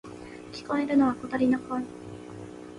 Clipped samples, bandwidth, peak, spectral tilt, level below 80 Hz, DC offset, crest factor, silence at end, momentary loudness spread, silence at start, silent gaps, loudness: under 0.1%; 11 kHz; -12 dBFS; -6.5 dB/octave; -60 dBFS; under 0.1%; 16 dB; 0 s; 19 LU; 0.05 s; none; -27 LUFS